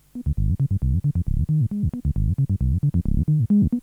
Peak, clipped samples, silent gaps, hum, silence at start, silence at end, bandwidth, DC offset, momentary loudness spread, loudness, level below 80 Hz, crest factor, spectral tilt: -8 dBFS; under 0.1%; none; none; 0.15 s; 0 s; 1.5 kHz; under 0.1%; 5 LU; -23 LUFS; -28 dBFS; 12 dB; -11.5 dB/octave